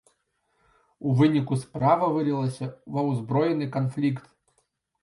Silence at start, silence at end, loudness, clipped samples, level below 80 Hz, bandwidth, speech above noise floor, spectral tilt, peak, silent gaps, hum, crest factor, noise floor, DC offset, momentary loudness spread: 1 s; 0.85 s; -25 LUFS; under 0.1%; -64 dBFS; 11.5 kHz; 48 dB; -8.5 dB/octave; -8 dBFS; none; none; 20 dB; -72 dBFS; under 0.1%; 10 LU